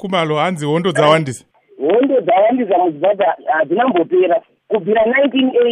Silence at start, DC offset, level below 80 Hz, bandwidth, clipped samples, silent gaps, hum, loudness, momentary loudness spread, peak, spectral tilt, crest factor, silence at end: 0 s; under 0.1%; -60 dBFS; 11.5 kHz; under 0.1%; none; none; -15 LUFS; 7 LU; 0 dBFS; -6 dB/octave; 14 dB; 0 s